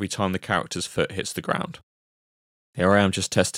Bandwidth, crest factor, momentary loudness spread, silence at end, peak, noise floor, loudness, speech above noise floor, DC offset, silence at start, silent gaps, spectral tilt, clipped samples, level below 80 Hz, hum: 16 kHz; 20 dB; 10 LU; 0 s; -4 dBFS; under -90 dBFS; -24 LUFS; over 66 dB; under 0.1%; 0 s; 1.83-2.73 s; -4.5 dB/octave; under 0.1%; -56 dBFS; none